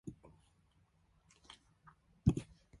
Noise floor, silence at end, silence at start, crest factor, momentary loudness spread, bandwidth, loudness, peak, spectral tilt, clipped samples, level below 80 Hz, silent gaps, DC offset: -73 dBFS; 0.35 s; 0.05 s; 28 dB; 24 LU; 11.5 kHz; -37 LUFS; -16 dBFS; -8 dB/octave; under 0.1%; -54 dBFS; none; under 0.1%